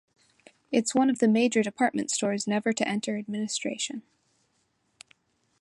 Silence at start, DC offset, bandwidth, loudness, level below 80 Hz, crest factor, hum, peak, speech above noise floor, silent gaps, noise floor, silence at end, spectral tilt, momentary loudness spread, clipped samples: 0.7 s; under 0.1%; 11.5 kHz; -27 LUFS; -76 dBFS; 20 dB; none; -8 dBFS; 46 dB; none; -72 dBFS; 1.6 s; -4 dB/octave; 9 LU; under 0.1%